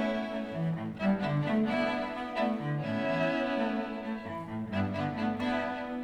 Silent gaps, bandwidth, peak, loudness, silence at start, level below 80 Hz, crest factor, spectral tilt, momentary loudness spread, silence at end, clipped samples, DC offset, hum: none; 10 kHz; -16 dBFS; -32 LUFS; 0 s; -60 dBFS; 16 dB; -7.5 dB/octave; 7 LU; 0 s; under 0.1%; under 0.1%; none